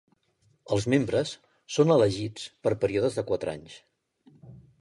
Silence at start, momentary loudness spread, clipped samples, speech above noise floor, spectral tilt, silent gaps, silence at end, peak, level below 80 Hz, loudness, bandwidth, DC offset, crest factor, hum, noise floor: 0.7 s; 14 LU; under 0.1%; 42 dB; -6 dB/octave; none; 0.25 s; -8 dBFS; -58 dBFS; -27 LUFS; 11.5 kHz; under 0.1%; 20 dB; none; -68 dBFS